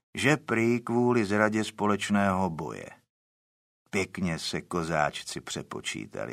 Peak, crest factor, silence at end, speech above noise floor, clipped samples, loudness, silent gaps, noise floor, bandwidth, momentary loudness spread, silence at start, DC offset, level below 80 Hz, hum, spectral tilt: -6 dBFS; 22 dB; 0 s; over 62 dB; under 0.1%; -28 LUFS; 3.10-3.86 s; under -90 dBFS; 15 kHz; 11 LU; 0.15 s; under 0.1%; -60 dBFS; none; -5 dB/octave